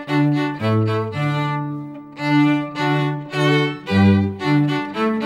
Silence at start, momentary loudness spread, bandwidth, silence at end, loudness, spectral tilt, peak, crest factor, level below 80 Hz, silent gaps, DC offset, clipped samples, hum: 0 s; 8 LU; 11.5 kHz; 0 s; -19 LUFS; -7.5 dB/octave; -4 dBFS; 16 dB; -62 dBFS; none; under 0.1%; under 0.1%; none